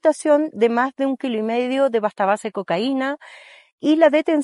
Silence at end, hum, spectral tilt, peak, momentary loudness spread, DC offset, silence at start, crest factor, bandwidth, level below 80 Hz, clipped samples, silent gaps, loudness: 0 s; none; -5 dB/octave; -2 dBFS; 8 LU; under 0.1%; 0.05 s; 18 dB; 11.5 kHz; -80 dBFS; under 0.1%; 3.72-3.78 s; -20 LUFS